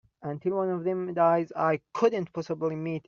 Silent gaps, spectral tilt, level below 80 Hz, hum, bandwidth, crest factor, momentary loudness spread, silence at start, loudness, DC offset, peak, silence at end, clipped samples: none; -6.5 dB/octave; -72 dBFS; none; 7.2 kHz; 18 dB; 9 LU; 0.2 s; -28 LUFS; under 0.1%; -10 dBFS; 0.1 s; under 0.1%